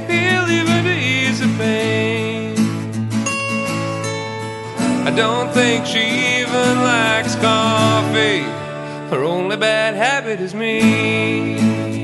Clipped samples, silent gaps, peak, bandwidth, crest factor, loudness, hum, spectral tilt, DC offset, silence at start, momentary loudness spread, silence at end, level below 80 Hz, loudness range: under 0.1%; none; -2 dBFS; 12 kHz; 16 dB; -17 LUFS; none; -4.5 dB/octave; under 0.1%; 0 s; 8 LU; 0 s; -54 dBFS; 5 LU